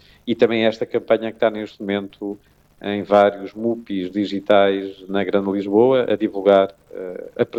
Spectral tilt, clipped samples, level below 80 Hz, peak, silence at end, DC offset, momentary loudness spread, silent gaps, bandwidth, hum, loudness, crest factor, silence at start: -7.5 dB/octave; under 0.1%; -60 dBFS; -2 dBFS; 0 s; under 0.1%; 15 LU; none; 7.6 kHz; none; -19 LUFS; 16 dB; 0.25 s